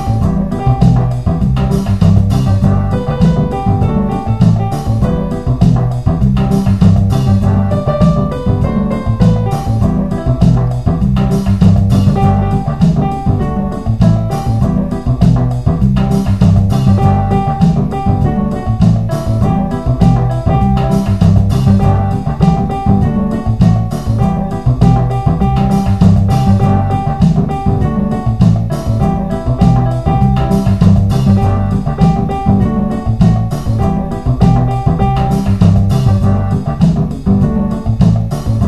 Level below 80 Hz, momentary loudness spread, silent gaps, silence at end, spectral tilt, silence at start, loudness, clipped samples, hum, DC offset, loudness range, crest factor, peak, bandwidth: -20 dBFS; 5 LU; none; 0 s; -9 dB/octave; 0 s; -12 LUFS; 0.2%; none; 3%; 1 LU; 10 dB; 0 dBFS; 12.5 kHz